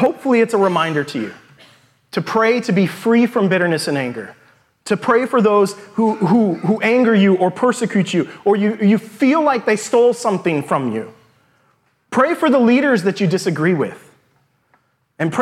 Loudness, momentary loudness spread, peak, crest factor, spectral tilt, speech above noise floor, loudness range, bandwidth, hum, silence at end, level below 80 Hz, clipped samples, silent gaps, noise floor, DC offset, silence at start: -16 LUFS; 10 LU; -2 dBFS; 14 dB; -6 dB/octave; 45 dB; 3 LU; 14 kHz; none; 0 s; -68 dBFS; under 0.1%; none; -61 dBFS; under 0.1%; 0 s